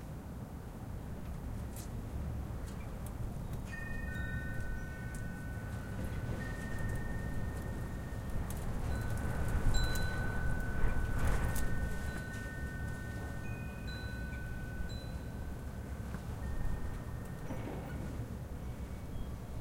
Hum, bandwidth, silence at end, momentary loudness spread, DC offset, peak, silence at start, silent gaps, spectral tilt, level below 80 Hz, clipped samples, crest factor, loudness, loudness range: none; 16.5 kHz; 0 s; 8 LU; under 0.1%; -18 dBFS; 0 s; none; -6 dB/octave; -40 dBFS; under 0.1%; 20 dB; -41 LUFS; 6 LU